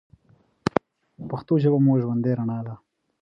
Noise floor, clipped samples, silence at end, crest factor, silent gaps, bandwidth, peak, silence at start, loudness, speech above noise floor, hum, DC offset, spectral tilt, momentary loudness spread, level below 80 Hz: -61 dBFS; under 0.1%; 0.45 s; 24 dB; none; 7.6 kHz; -2 dBFS; 0.65 s; -24 LUFS; 39 dB; none; under 0.1%; -9.5 dB/octave; 17 LU; -58 dBFS